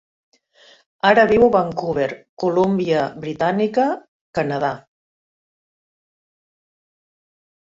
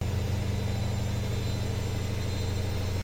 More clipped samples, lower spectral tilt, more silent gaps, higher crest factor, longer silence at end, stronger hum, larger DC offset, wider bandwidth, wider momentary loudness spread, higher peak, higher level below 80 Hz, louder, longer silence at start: neither; about the same, -7 dB/octave vs -6 dB/octave; first, 2.29-2.37 s, 4.08-4.33 s vs none; first, 20 dB vs 10 dB; first, 2.95 s vs 0 s; neither; neither; second, 7.8 kHz vs 16.5 kHz; first, 12 LU vs 1 LU; first, -2 dBFS vs -18 dBFS; second, -54 dBFS vs -42 dBFS; first, -19 LUFS vs -31 LUFS; first, 1.05 s vs 0 s